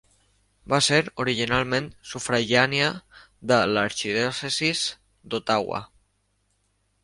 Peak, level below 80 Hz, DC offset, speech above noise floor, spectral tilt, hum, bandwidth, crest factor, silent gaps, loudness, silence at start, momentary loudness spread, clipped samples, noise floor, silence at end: -2 dBFS; -56 dBFS; under 0.1%; 46 dB; -3.5 dB/octave; 50 Hz at -55 dBFS; 11.5 kHz; 22 dB; none; -23 LUFS; 0.65 s; 12 LU; under 0.1%; -70 dBFS; 1.2 s